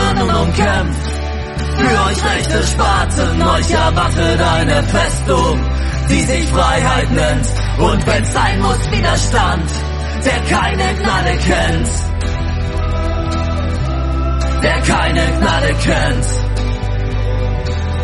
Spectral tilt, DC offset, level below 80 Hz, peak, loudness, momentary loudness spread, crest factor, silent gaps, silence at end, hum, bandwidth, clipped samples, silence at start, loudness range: -5 dB/octave; under 0.1%; -18 dBFS; 0 dBFS; -15 LUFS; 6 LU; 14 dB; none; 0 s; none; 11.5 kHz; under 0.1%; 0 s; 3 LU